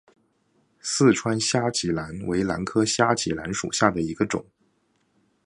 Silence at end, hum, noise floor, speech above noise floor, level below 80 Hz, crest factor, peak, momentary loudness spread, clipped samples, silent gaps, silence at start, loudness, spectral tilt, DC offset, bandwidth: 1.05 s; none; -68 dBFS; 45 dB; -52 dBFS; 24 dB; -2 dBFS; 8 LU; under 0.1%; none; 0.85 s; -24 LUFS; -4 dB/octave; under 0.1%; 11.5 kHz